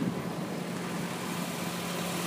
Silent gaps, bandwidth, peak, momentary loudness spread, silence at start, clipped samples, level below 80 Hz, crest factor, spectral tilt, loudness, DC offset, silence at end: none; 15.5 kHz; -18 dBFS; 2 LU; 0 s; under 0.1%; -66 dBFS; 16 dB; -4.5 dB/octave; -34 LUFS; under 0.1%; 0 s